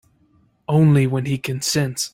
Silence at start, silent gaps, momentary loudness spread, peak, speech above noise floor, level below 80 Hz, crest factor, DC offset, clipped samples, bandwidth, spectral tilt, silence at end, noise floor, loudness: 0.7 s; none; 8 LU; -6 dBFS; 41 dB; -52 dBFS; 12 dB; under 0.1%; under 0.1%; 16 kHz; -5.5 dB/octave; 0.05 s; -59 dBFS; -19 LUFS